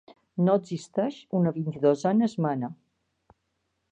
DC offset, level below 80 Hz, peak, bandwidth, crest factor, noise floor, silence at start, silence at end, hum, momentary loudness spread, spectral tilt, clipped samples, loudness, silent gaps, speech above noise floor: under 0.1%; -72 dBFS; -10 dBFS; 9.2 kHz; 18 dB; -77 dBFS; 0.35 s; 1.2 s; none; 9 LU; -8 dB/octave; under 0.1%; -26 LUFS; none; 52 dB